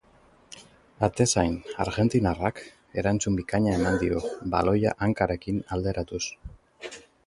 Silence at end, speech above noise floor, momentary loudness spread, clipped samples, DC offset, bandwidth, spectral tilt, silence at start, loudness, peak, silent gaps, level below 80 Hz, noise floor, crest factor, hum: 0.25 s; 33 dB; 19 LU; under 0.1%; under 0.1%; 11.5 kHz; -5.5 dB/octave; 0.5 s; -26 LUFS; -6 dBFS; none; -44 dBFS; -58 dBFS; 20 dB; none